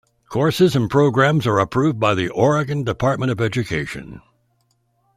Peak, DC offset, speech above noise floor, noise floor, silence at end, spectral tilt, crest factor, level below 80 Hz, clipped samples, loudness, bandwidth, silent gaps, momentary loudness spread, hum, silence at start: -2 dBFS; under 0.1%; 47 dB; -65 dBFS; 1 s; -6.5 dB/octave; 16 dB; -48 dBFS; under 0.1%; -18 LUFS; 15.5 kHz; none; 9 LU; none; 0.3 s